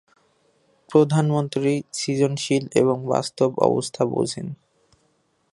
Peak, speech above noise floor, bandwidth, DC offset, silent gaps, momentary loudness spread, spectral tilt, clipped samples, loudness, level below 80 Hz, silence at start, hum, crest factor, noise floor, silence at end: -2 dBFS; 45 dB; 11.5 kHz; under 0.1%; none; 7 LU; -6 dB/octave; under 0.1%; -22 LUFS; -66 dBFS; 0.9 s; none; 22 dB; -66 dBFS; 1 s